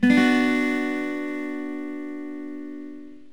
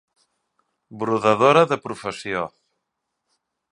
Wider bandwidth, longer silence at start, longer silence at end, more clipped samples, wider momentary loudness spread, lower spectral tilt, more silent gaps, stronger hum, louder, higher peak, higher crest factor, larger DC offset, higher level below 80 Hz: first, 19 kHz vs 11 kHz; second, 0 s vs 0.9 s; second, 0.15 s vs 1.25 s; neither; first, 19 LU vs 15 LU; about the same, -5.5 dB/octave vs -5.5 dB/octave; neither; neither; second, -25 LUFS vs -20 LUFS; second, -6 dBFS vs 0 dBFS; about the same, 18 dB vs 22 dB; first, 0.6% vs under 0.1%; about the same, -68 dBFS vs -64 dBFS